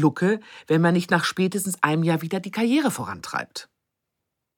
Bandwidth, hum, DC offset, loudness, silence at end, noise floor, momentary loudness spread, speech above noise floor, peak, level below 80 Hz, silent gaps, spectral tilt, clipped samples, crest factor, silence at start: 19 kHz; none; under 0.1%; -23 LUFS; 0.95 s; -81 dBFS; 10 LU; 59 dB; -2 dBFS; -70 dBFS; none; -5.5 dB/octave; under 0.1%; 22 dB; 0 s